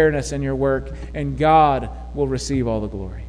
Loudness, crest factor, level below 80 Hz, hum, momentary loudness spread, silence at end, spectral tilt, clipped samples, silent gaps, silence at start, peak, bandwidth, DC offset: -20 LUFS; 16 dB; -32 dBFS; none; 13 LU; 0 s; -6 dB/octave; under 0.1%; none; 0 s; -4 dBFS; 11 kHz; under 0.1%